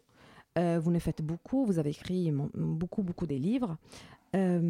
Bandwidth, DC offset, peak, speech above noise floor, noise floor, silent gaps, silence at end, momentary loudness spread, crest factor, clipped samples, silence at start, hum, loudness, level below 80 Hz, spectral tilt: 12 kHz; under 0.1%; -18 dBFS; 28 dB; -58 dBFS; none; 0 s; 8 LU; 14 dB; under 0.1%; 0.35 s; none; -32 LUFS; -56 dBFS; -8.5 dB/octave